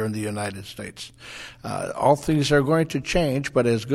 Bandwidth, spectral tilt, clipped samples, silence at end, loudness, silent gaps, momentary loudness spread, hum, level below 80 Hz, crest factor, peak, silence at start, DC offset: 15.5 kHz; -5.5 dB/octave; under 0.1%; 0 s; -23 LUFS; none; 17 LU; none; -44 dBFS; 18 dB; -4 dBFS; 0 s; under 0.1%